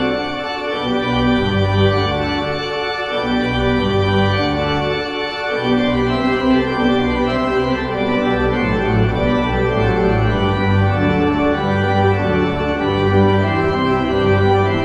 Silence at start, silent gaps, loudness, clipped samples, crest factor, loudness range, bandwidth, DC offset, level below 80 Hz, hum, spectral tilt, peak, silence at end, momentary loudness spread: 0 s; none; -17 LUFS; under 0.1%; 14 dB; 2 LU; 8.2 kHz; under 0.1%; -32 dBFS; none; -7.5 dB/octave; -2 dBFS; 0 s; 5 LU